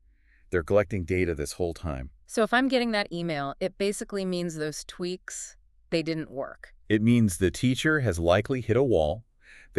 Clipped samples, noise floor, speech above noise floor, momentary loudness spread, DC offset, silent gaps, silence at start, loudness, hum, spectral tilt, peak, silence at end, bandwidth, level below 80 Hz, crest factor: under 0.1%; -59 dBFS; 33 dB; 13 LU; under 0.1%; none; 0.5 s; -27 LUFS; none; -5.5 dB/octave; -10 dBFS; 0 s; 13.5 kHz; -46 dBFS; 18 dB